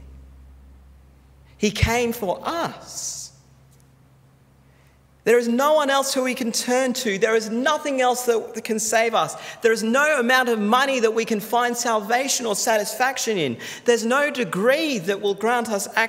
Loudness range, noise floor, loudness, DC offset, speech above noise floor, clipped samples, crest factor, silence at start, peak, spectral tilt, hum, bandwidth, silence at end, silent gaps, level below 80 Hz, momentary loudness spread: 7 LU; -54 dBFS; -21 LUFS; under 0.1%; 33 dB; under 0.1%; 20 dB; 0 s; -4 dBFS; -3 dB/octave; none; 16 kHz; 0 s; none; -46 dBFS; 8 LU